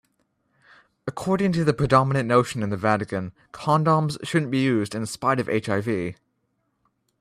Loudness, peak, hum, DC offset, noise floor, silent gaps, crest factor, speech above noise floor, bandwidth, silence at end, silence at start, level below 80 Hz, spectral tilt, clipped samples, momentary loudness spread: -23 LUFS; -4 dBFS; none; under 0.1%; -73 dBFS; none; 20 dB; 50 dB; 14 kHz; 1.05 s; 1.05 s; -54 dBFS; -6.5 dB/octave; under 0.1%; 11 LU